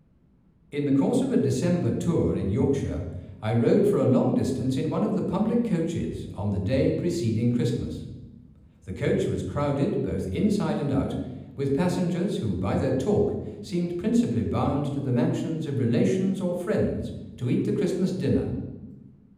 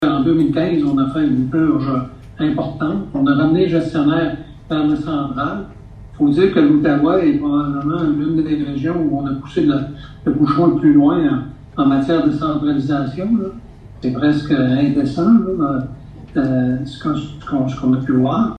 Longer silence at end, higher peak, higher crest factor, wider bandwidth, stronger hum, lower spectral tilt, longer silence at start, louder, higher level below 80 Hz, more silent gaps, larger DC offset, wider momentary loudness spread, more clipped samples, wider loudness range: first, 0.3 s vs 0.05 s; second, -10 dBFS vs -2 dBFS; about the same, 16 dB vs 14 dB; first, 14.5 kHz vs 6.4 kHz; neither; about the same, -8 dB/octave vs -9 dB/octave; first, 0.75 s vs 0 s; second, -26 LUFS vs -17 LUFS; second, -50 dBFS vs -42 dBFS; neither; neither; about the same, 10 LU vs 10 LU; neither; about the same, 3 LU vs 2 LU